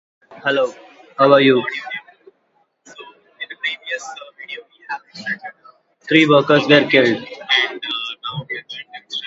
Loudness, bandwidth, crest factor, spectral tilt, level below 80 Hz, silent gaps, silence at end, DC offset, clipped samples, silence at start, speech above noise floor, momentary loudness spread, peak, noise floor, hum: -17 LUFS; 7.8 kHz; 20 dB; -5 dB/octave; -68 dBFS; none; 0 s; under 0.1%; under 0.1%; 0.3 s; 47 dB; 20 LU; 0 dBFS; -63 dBFS; none